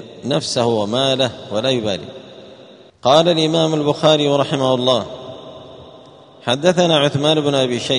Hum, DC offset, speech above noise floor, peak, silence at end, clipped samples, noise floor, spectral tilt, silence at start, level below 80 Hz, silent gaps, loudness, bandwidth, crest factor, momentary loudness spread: none; under 0.1%; 27 dB; 0 dBFS; 0 s; under 0.1%; -43 dBFS; -5 dB/octave; 0 s; -58 dBFS; none; -16 LUFS; 10.5 kHz; 18 dB; 18 LU